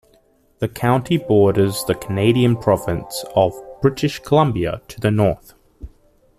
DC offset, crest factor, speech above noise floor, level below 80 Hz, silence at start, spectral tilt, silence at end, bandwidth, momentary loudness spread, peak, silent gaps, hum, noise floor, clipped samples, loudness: under 0.1%; 16 dB; 39 dB; -44 dBFS; 0.6 s; -6.5 dB/octave; 0.5 s; 15 kHz; 9 LU; -2 dBFS; none; none; -57 dBFS; under 0.1%; -18 LUFS